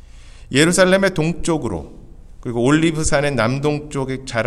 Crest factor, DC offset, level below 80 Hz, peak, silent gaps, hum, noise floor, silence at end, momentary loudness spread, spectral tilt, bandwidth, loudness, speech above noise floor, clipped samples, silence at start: 18 dB; under 0.1%; -36 dBFS; 0 dBFS; none; none; -39 dBFS; 0 s; 12 LU; -5 dB/octave; 14.5 kHz; -18 LUFS; 22 dB; under 0.1%; 0.15 s